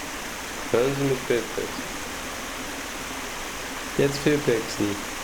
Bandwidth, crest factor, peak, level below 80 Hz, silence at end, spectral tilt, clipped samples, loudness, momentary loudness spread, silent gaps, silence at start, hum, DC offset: over 20 kHz; 18 dB; -8 dBFS; -46 dBFS; 0 s; -4 dB/octave; under 0.1%; -27 LUFS; 9 LU; none; 0 s; none; under 0.1%